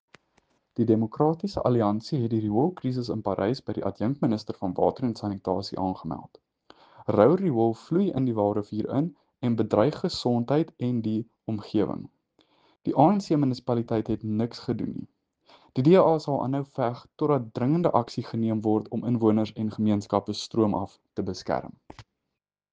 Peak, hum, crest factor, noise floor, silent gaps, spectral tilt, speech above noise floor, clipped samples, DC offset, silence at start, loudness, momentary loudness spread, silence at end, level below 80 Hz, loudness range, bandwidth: -4 dBFS; none; 22 dB; -85 dBFS; none; -8 dB/octave; 60 dB; under 0.1%; under 0.1%; 0.8 s; -26 LUFS; 11 LU; 0.7 s; -60 dBFS; 4 LU; 9 kHz